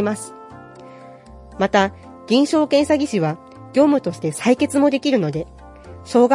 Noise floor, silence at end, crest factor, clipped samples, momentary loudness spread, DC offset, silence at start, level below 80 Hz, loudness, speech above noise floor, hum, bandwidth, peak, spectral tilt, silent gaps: -41 dBFS; 0 s; 18 dB; under 0.1%; 22 LU; under 0.1%; 0 s; -50 dBFS; -19 LUFS; 24 dB; none; 11.5 kHz; -2 dBFS; -5.5 dB/octave; none